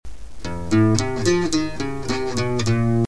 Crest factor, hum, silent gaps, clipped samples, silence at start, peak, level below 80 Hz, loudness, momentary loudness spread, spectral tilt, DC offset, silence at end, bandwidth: 20 dB; none; none; under 0.1%; 0 s; 0 dBFS; -38 dBFS; -21 LUFS; 11 LU; -5.5 dB/octave; 3%; 0 s; 11 kHz